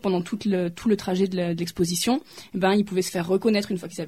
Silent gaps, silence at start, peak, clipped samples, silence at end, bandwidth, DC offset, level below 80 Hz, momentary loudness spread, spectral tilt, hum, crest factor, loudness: none; 0.05 s; -10 dBFS; under 0.1%; 0 s; 16 kHz; 0.1%; -58 dBFS; 5 LU; -5 dB/octave; none; 14 dB; -24 LUFS